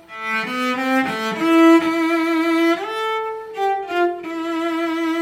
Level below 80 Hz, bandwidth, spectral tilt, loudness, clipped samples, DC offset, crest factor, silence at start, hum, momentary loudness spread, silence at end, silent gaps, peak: -68 dBFS; 15.5 kHz; -4 dB/octave; -19 LUFS; under 0.1%; under 0.1%; 14 dB; 0.1 s; none; 10 LU; 0 s; none; -4 dBFS